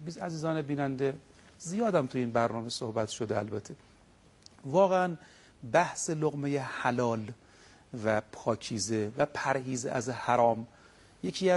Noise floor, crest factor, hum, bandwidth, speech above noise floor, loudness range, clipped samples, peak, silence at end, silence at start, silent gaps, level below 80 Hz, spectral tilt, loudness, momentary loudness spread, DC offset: -60 dBFS; 22 dB; none; 11.5 kHz; 30 dB; 3 LU; under 0.1%; -10 dBFS; 0 s; 0 s; none; -66 dBFS; -5 dB/octave; -31 LUFS; 18 LU; under 0.1%